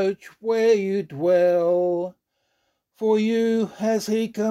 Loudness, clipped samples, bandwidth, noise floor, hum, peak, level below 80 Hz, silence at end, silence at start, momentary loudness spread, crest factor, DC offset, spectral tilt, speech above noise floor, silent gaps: -22 LUFS; under 0.1%; 14 kHz; -72 dBFS; none; -8 dBFS; -72 dBFS; 0 s; 0 s; 8 LU; 14 dB; under 0.1%; -6 dB/octave; 51 dB; none